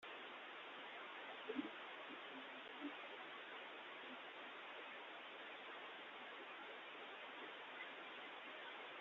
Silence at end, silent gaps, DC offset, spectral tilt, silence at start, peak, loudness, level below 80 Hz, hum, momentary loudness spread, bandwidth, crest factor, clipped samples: 0 s; none; under 0.1%; 0.5 dB/octave; 0 s; -34 dBFS; -53 LUFS; under -90 dBFS; none; 2 LU; 7.2 kHz; 20 dB; under 0.1%